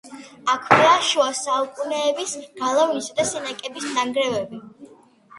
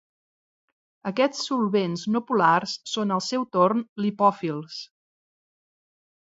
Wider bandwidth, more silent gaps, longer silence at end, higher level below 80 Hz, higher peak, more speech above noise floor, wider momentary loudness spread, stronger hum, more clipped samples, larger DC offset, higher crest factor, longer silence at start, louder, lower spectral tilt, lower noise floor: first, 11.5 kHz vs 7.8 kHz; second, none vs 3.89-3.96 s; second, 0 s vs 1.35 s; first, -66 dBFS vs -74 dBFS; first, 0 dBFS vs -6 dBFS; second, 29 dB vs over 66 dB; first, 14 LU vs 10 LU; neither; neither; neither; about the same, 22 dB vs 20 dB; second, 0.05 s vs 1.05 s; first, -21 LUFS vs -24 LUFS; second, -2.5 dB/octave vs -5 dB/octave; second, -50 dBFS vs under -90 dBFS